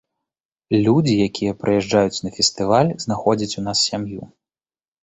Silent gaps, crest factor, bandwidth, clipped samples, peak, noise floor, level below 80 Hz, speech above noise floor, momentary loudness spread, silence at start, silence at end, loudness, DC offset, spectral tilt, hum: none; 18 dB; 8.4 kHz; under 0.1%; -2 dBFS; under -90 dBFS; -52 dBFS; over 71 dB; 6 LU; 0.7 s; 0.75 s; -19 LUFS; under 0.1%; -5 dB/octave; none